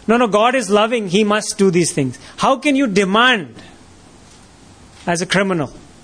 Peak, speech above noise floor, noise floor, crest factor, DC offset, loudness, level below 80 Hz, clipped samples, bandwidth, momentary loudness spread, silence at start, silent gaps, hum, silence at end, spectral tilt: -2 dBFS; 28 dB; -44 dBFS; 16 dB; under 0.1%; -16 LUFS; -52 dBFS; under 0.1%; 11 kHz; 9 LU; 0.1 s; none; none; 0.25 s; -4 dB/octave